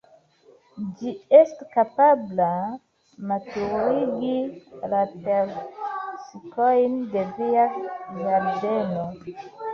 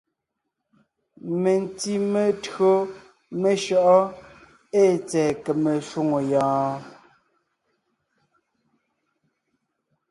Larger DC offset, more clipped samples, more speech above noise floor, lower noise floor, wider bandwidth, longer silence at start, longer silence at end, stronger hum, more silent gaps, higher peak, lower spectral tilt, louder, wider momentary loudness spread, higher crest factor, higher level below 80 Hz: neither; neither; second, 33 dB vs 60 dB; second, -56 dBFS vs -81 dBFS; second, 6.8 kHz vs 11.5 kHz; second, 0.75 s vs 1.25 s; second, 0 s vs 3.2 s; neither; neither; about the same, -4 dBFS vs -6 dBFS; first, -8 dB/octave vs -6 dB/octave; about the same, -23 LUFS vs -22 LUFS; first, 17 LU vs 10 LU; about the same, 20 dB vs 18 dB; about the same, -64 dBFS vs -66 dBFS